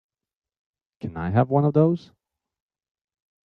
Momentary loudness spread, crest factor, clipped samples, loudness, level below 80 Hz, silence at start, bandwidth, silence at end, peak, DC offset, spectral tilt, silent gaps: 15 LU; 20 dB; under 0.1%; -22 LUFS; -60 dBFS; 1.05 s; 5.4 kHz; 1.45 s; -6 dBFS; under 0.1%; -11 dB/octave; none